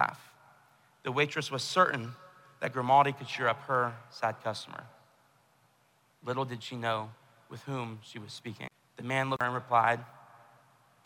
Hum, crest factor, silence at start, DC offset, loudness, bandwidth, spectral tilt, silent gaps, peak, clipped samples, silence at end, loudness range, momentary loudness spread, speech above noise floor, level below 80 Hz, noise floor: none; 22 dB; 0 s; under 0.1%; -31 LUFS; 16 kHz; -4.5 dB/octave; none; -10 dBFS; under 0.1%; 0.85 s; 9 LU; 19 LU; 37 dB; -78 dBFS; -68 dBFS